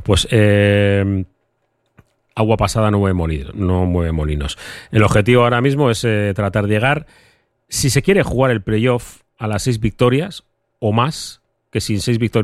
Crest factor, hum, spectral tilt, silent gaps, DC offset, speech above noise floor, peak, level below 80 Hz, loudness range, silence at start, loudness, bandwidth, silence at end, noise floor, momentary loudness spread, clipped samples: 16 dB; none; -5.5 dB/octave; none; under 0.1%; 51 dB; 0 dBFS; -34 dBFS; 3 LU; 0 s; -16 LUFS; 13.5 kHz; 0 s; -67 dBFS; 11 LU; under 0.1%